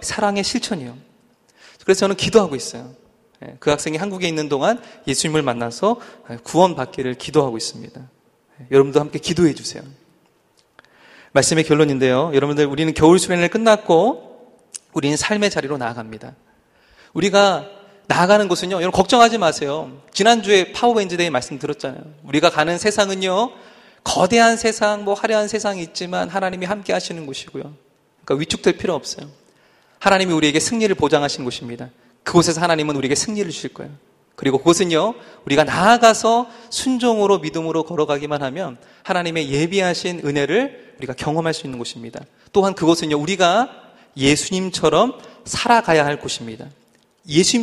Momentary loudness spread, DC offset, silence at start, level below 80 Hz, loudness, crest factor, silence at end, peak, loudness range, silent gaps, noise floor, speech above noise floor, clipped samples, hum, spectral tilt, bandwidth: 15 LU; under 0.1%; 0 s; -52 dBFS; -18 LUFS; 18 dB; 0 s; 0 dBFS; 5 LU; none; -59 dBFS; 41 dB; under 0.1%; none; -4 dB/octave; 13 kHz